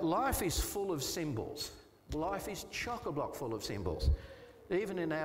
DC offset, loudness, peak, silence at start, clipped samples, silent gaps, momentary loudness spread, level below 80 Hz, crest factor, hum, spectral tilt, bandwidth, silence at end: under 0.1%; -37 LUFS; -20 dBFS; 0 s; under 0.1%; none; 10 LU; -44 dBFS; 16 dB; none; -4.5 dB/octave; 16 kHz; 0 s